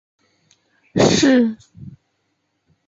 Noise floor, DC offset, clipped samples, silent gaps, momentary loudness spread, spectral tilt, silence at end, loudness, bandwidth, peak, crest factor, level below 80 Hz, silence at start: -70 dBFS; under 0.1%; under 0.1%; none; 14 LU; -4.5 dB/octave; 1 s; -16 LUFS; 7.8 kHz; -4 dBFS; 18 dB; -50 dBFS; 0.95 s